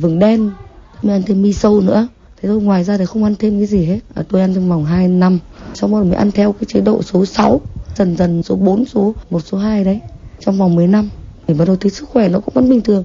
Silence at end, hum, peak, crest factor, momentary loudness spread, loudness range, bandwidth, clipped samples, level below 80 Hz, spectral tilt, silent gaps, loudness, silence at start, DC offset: 0 s; none; 0 dBFS; 14 dB; 8 LU; 1 LU; 7.4 kHz; under 0.1%; -36 dBFS; -8 dB/octave; none; -14 LUFS; 0 s; under 0.1%